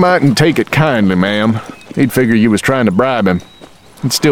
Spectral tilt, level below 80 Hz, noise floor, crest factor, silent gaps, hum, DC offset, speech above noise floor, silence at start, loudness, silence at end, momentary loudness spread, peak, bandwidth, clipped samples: -5.5 dB/octave; -42 dBFS; -39 dBFS; 12 dB; none; none; 0.6%; 27 dB; 0 s; -12 LUFS; 0 s; 8 LU; 0 dBFS; 17 kHz; under 0.1%